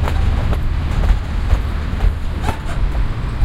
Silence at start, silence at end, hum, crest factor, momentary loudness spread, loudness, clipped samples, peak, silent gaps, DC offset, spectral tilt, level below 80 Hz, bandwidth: 0 s; 0 s; none; 16 dB; 4 LU; -21 LUFS; under 0.1%; 0 dBFS; none; under 0.1%; -7 dB/octave; -18 dBFS; 12 kHz